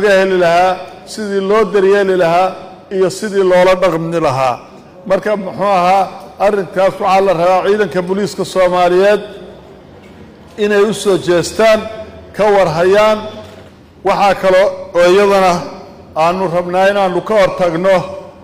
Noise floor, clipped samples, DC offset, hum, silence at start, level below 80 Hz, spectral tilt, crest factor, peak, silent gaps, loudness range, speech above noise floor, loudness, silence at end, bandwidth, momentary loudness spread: -38 dBFS; under 0.1%; under 0.1%; none; 0 s; -44 dBFS; -5 dB/octave; 10 dB; -2 dBFS; none; 2 LU; 26 dB; -12 LUFS; 0.15 s; 16 kHz; 13 LU